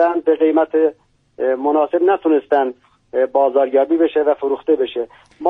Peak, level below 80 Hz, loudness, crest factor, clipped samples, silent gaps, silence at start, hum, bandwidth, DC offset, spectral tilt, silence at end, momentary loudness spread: -2 dBFS; -62 dBFS; -17 LUFS; 14 dB; under 0.1%; none; 0 s; none; 3.9 kHz; under 0.1%; -6.5 dB/octave; 0 s; 8 LU